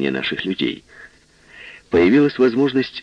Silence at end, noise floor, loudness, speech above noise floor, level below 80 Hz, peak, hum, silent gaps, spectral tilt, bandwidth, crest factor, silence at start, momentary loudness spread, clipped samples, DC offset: 0 s; -48 dBFS; -18 LUFS; 30 dB; -52 dBFS; -4 dBFS; none; none; -7 dB/octave; 7.4 kHz; 16 dB; 0 s; 20 LU; under 0.1%; under 0.1%